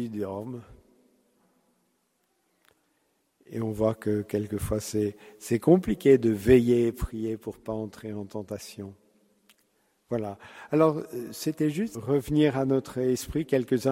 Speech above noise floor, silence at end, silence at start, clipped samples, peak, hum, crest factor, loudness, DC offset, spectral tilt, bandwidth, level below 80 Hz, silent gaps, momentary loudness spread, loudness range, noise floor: 47 dB; 0 s; 0 s; under 0.1%; -6 dBFS; none; 22 dB; -27 LUFS; under 0.1%; -7 dB/octave; 16 kHz; -50 dBFS; none; 17 LU; 13 LU; -73 dBFS